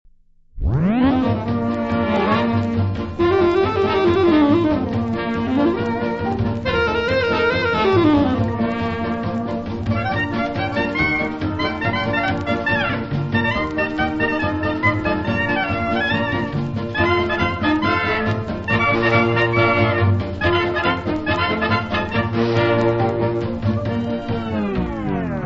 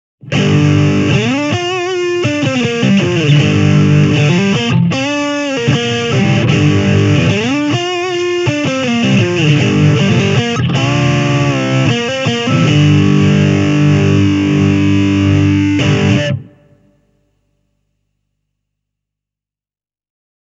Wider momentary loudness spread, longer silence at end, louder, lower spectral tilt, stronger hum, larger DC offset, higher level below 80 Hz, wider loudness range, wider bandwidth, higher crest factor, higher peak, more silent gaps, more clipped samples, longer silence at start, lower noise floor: about the same, 7 LU vs 5 LU; second, 0 s vs 4.1 s; second, -19 LUFS vs -12 LUFS; first, -7.5 dB/octave vs -6 dB/octave; second, none vs 50 Hz at -30 dBFS; neither; first, -38 dBFS vs -44 dBFS; about the same, 3 LU vs 3 LU; about the same, 7.6 kHz vs 8 kHz; about the same, 16 dB vs 12 dB; second, -4 dBFS vs 0 dBFS; neither; neither; first, 0.55 s vs 0.25 s; second, -50 dBFS vs under -90 dBFS